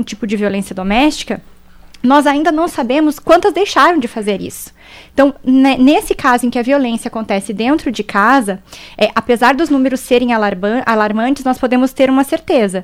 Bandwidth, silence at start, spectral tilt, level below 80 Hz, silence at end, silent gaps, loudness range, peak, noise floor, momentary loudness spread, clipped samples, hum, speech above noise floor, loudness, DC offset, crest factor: 15.5 kHz; 0 s; -4.5 dB/octave; -40 dBFS; 0 s; none; 2 LU; 0 dBFS; -38 dBFS; 9 LU; under 0.1%; none; 25 dB; -13 LUFS; under 0.1%; 14 dB